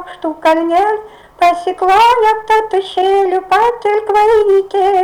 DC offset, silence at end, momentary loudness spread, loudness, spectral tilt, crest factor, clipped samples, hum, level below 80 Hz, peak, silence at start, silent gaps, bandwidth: under 0.1%; 0 s; 6 LU; -12 LUFS; -3.5 dB/octave; 8 dB; under 0.1%; none; -46 dBFS; -4 dBFS; 0 s; none; 18 kHz